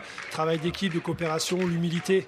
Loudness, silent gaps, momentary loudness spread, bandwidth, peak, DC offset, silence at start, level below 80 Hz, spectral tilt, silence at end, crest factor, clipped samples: -28 LUFS; none; 3 LU; 15 kHz; -12 dBFS; under 0.1%; 0 s; -58 dBFS; -5 dB/octave; 0 s; 16 dB; under 0.1%